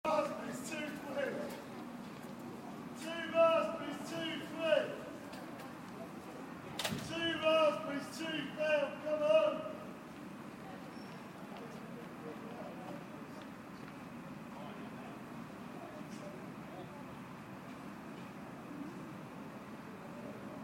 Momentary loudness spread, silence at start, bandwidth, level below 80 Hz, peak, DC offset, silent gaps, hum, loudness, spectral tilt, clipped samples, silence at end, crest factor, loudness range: 18 LU; 0.05 s; 16.5 kHz; -74 dBFS; -18 dBFS; under 0.1%; none; none; -40 LUFS; -4.5 dB/octave; under 0.1%; 0 s; 20 dB; 14 LU